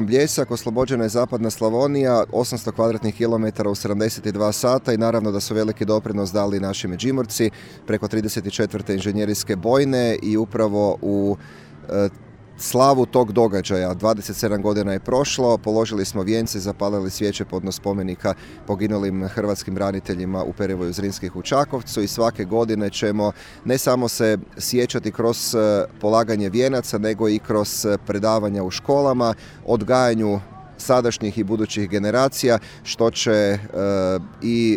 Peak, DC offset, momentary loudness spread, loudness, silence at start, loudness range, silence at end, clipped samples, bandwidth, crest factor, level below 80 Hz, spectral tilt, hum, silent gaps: -2 dBFS; under 0.1%; 6 LU; -21 LUFS; 0 s; 4 LU; 0 s; under 0.1%; 19 kHz; 18 dB; -50 dBFS; -5 dB/octave; none; none